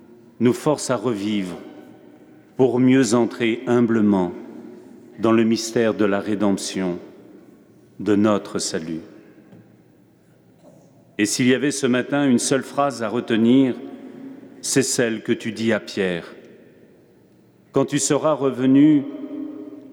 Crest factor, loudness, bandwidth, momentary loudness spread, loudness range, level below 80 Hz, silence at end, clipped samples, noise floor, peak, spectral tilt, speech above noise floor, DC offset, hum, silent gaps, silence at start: 16 dB; -20 LUFS; 17 kHz; 17 LU; 6 LU; -68 dBFS; 0 s; under 0.1%; -54 dBFS; -6 dBFS; -5 dB/octave; 35 dB; under 0.1%; none; none; 0.4 s